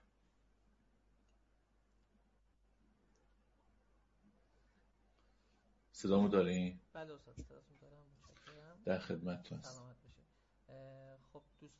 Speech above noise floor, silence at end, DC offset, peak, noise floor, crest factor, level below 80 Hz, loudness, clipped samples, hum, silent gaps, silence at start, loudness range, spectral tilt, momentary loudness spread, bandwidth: 35 dB; 0.15 s; under 0.1%; -20 dBFS; -75 dBFS; 26 dB; -70 dBFS; -38 LUFS; under 0.1%; none; none; 5.95 s; 8 LU; -6.5 dB/octave; 27 LU; 7.6 kHz